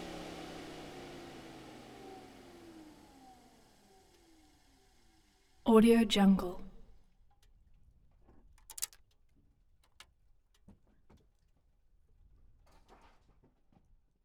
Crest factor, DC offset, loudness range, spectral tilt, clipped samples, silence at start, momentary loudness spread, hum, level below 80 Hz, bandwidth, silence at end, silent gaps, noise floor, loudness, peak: 24 dB; under 0.1%; 22 LU; -5.5 dB/octave; under 0.1%; 0 s; 28 LU; none; -60 dBFS; 17.5 kHz; 5.4 s; none; -70 dBFS; -30 LUFS; -12 dBFS